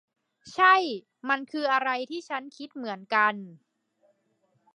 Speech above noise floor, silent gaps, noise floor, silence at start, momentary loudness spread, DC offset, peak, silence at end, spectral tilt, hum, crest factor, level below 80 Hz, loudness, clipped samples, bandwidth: 45 dB; none; -71 dBFS; 0.45 s; 18 LU; under 0.1%; -8 dBFS; 1.2 s; -3.5 dB/octave; none; 20 dB; -84 dBFS; -26 LUFS; under 0.1%; 9.8 kHz